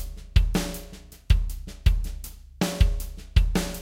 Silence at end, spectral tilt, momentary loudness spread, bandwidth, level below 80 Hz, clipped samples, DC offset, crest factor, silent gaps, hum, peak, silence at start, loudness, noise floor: 0 s; -5.5 dB/octave; 16 LU; 16.5 kHz; -26 dBFS; under 0.1%; under 0.1%; 18 dB; none; none; -6 dBFS; 0 s; -27 LUFS; -44 dBFS